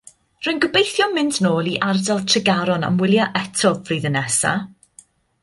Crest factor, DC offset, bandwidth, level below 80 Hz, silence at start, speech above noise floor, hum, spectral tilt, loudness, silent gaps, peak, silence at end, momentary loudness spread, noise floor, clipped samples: 18 dB; under 0.1%; 11.5 kHz; -58 dBFS; 0.4 s; 32 dB; none; -4 dB/octave; -19 LUFS; none; -2 dBFS; 0.75 s; 5 LU; -51 dBFS; under 0.1%